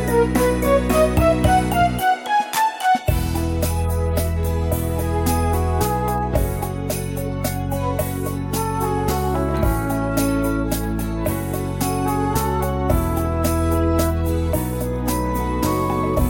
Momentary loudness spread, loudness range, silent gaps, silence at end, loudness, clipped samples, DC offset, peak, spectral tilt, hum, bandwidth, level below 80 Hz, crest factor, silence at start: 7 LU; 4 LU; none; 0 s; -21 LUFS; under 0.1%; under 0.1%; -4 dBFS; -6 dB/octave; none; 17.5 kHz; -28 dBFS; 16 dB; 0 s